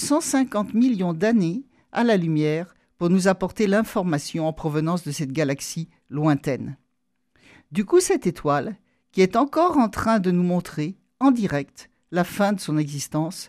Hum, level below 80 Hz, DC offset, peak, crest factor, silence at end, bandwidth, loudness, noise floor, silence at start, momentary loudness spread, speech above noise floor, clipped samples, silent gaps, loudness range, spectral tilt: none; -54 dBFS; under 0.1%; -6 dBFS; 16 dB; 0 s; 14.5 kHz; -23 LUFS; -76 dBFS; 0 s; 11 LU; 54 dB; under 0.1%; none; 4 LU; -6 dB/octave